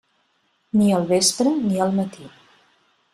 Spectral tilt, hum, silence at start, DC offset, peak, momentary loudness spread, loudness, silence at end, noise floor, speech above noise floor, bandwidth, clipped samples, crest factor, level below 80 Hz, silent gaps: -4.5 dB/octave; none; 0.75 s; under 0.1%; -4 dBFS; 7 LU; -20 LUFS; 0.85 s; -67 dBFS; 47 dB; 13.5 kHz; under 0.1%; 18 dB; -62 dBFS; none